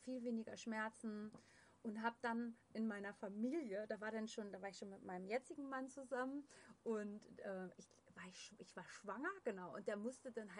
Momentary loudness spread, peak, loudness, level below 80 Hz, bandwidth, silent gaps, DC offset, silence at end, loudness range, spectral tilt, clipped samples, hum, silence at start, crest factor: 11 LU; -28 dBFS; -49 LUFS; under -90 dBFS; 10.5 kHz; none; under 0.1%; 0 s; 4 LU; -5 dB/octave; under 0.1%; none; 0 s; 20 dB